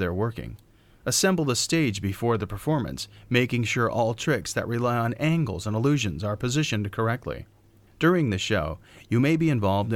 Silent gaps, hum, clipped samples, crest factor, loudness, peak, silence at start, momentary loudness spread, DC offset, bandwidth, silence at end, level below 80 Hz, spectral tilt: none; none; under 0.1%; 18 dB; -25 LUFS; -6 dBFS; 0 s; 10 LU; under 0.1%; 17 kHz; 0 s; -50 dBFS; -5 dB/octave